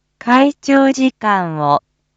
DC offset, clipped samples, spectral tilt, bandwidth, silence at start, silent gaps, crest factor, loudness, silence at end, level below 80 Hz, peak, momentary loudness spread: under 0.1%; under 0.1%; -5.5 dB/octave; 7.8 kHz; 0.25 s; none; 14 dB; -14 LUFS; 0.35 s; -62 dBFS; 0 dBFS; 4 LU